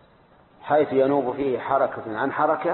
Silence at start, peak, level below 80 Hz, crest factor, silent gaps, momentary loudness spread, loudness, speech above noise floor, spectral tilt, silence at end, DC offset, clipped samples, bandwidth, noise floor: 0.65 s; -8 dBFS; -62 dBFS; 14 dB; none; 6 LU; -23 LUFS; 33 dB; -11 dB/octave; 0 s; under 0.1%; under 0.1%; 4.3 kHz; -55 dBFS